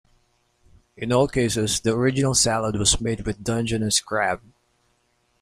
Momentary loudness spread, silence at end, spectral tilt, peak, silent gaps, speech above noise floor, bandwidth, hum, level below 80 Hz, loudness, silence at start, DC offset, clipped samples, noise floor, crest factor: 7 LU; 1.05 s; -3.5 dB/octave; -4 dBFS; none; 45 dB; 15.5 kHz; none; -42 dBFS; -22 LUFS; 1 s; under 0.1%; under 0.1%; -67 dBFS; 20 dB